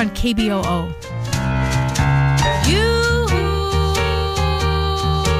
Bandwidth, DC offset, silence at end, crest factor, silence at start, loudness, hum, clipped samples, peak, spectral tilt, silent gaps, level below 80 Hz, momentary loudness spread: 15.5 kHz; under 0.1%; 0 s; 12 dB; 0 s; -18 LUFS; none; under 0.1%; -6 dBFS; -5 dB/octave; none; -24 dBFS; 6 LU